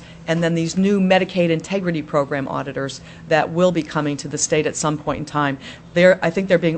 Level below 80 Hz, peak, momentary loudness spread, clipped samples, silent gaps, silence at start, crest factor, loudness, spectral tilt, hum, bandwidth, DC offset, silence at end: -50 dBFS; -2 dBFS; 9 LU; under 0.1%; none; 0 s; 18 dB; -19 LUFS; -5 dB/octave; none; 8.6 kHz; under 0.1%; 0 s